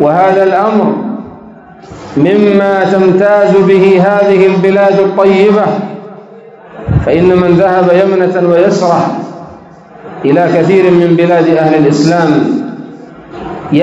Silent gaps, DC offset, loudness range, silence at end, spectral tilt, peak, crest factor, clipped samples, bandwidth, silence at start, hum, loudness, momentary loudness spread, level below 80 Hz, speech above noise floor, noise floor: none; under 0.1%; 3 LU; 0 s; -7.5 dB/octave; 0 dBFS; 8 dB; 2%; 8 kHz; 0 s; none; -8 LUFS; 17 LU; -36 dBFS; 26 dB; -33 dBFS